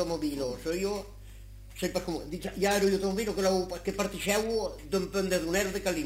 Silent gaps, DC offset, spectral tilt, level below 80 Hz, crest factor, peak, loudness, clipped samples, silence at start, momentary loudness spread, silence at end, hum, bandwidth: none; under 0.1%; -4.5 dB/octave; -48 dBFS; 18 dB; -12 dBFS; -30 LUFS; under 0.1%; 0 s; 11 LU; 0 s; none; 16 kHz